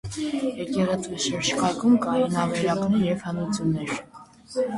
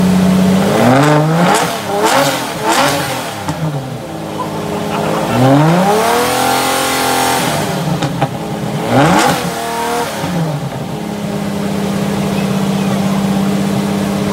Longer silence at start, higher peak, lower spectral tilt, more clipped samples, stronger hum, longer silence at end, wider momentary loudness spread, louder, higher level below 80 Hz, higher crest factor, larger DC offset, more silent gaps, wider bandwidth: about the same, 0.05 s vs 0 s; second, -10 dBFS vs 0 dBFS; about the same, -5 dB/octave vs -5 dB/octave; neither; neither; about the same, 0 s vs 0 s; about the same, 8 LU vs 10 LU; second, -25 LUFS vs -14 LUFS; second, -54 dBFS vs -42 dBFS; about the same, 14 dB vs 14 dB; neither; neither; second, 11.5 kHz vs 16.5 kHz